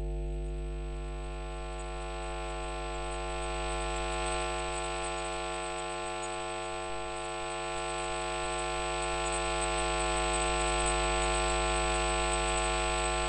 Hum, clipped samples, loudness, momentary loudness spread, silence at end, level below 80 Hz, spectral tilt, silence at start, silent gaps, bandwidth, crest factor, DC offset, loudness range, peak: none; under 0.1%; -33 LUFS; 10 LU; 0 s; -40 dBFS; -3 dB/octave; 0 s; none; 10.5 kHz; 16 dB; under 0.1%; 8 LU; -18 dBFS